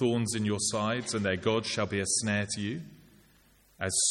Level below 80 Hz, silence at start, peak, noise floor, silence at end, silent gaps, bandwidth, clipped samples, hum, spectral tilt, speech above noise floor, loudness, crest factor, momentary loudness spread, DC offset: -64 dBFS; 0 s; -12 dBFS; -63 dBFS; 0 s; none; 14.5 kHz; under 0.1%; none; -3.5 dB/octave; 33 dB; -30 LUFS; 18 dB; 9 LU; under 0.1%